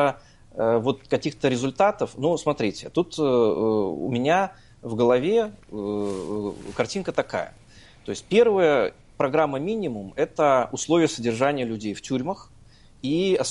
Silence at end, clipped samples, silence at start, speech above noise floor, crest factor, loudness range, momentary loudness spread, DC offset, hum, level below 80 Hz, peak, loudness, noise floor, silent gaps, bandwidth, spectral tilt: 0 s; under 0.1%; 0 s; 28 dB; 18 dB; 3 LU; 11 LU; under 0.1%; none; -54 dBFS; -4 dBFS; -24 LUFS; -51 dBFS; none; 11.5 kHz; -5.5 dB/octave